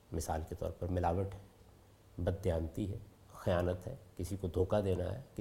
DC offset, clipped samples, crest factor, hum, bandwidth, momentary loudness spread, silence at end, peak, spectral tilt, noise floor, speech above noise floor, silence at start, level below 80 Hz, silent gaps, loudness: under 0.1%; under 0.1%; 18 dB; none; 16.5 kHz; 12 LU; 0 s; -18 dBFS; -7 dB/octave; -61 dBFS; 25 dB; 0.1 s; -54 dBFS; none; -38 LUFS